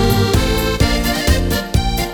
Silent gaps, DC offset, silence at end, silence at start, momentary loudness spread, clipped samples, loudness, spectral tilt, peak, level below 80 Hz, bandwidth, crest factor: none; under 0.1%; 0 s; 0 s; 3 LU; under 0.1%; -16 LUFS; -5 dB/octave; 0 dBFS; -20 dBFS; over 20 kHz; 14 dB